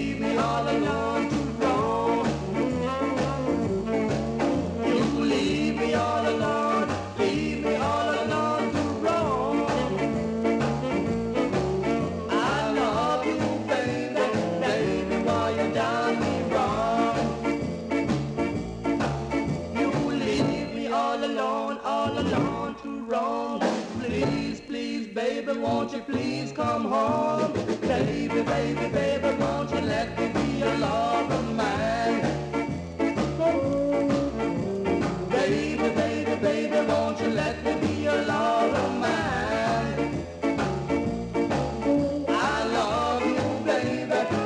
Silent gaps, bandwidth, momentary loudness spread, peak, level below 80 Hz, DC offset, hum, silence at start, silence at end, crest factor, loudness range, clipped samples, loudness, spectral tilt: none; 10.5 kHz; 4 LU; -12 dBFS; -46 dBFS; under 0.1%; none; 0 s; 0 s; 14 dB; 2 LU; under 0.1%; -26 LUFS; -6 dB/octave